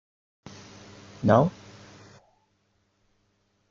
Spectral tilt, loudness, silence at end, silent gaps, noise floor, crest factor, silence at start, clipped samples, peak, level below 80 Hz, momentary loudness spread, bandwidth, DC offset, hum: -8 dB/octave; -23 LUFS; 2.2 s; none; -71 dBFS; 26 dB; 1.2 s; under 0.1%; -4 dBFS; -60 dBFS; 27 LU; 7.4 kHz; under 0.1%; none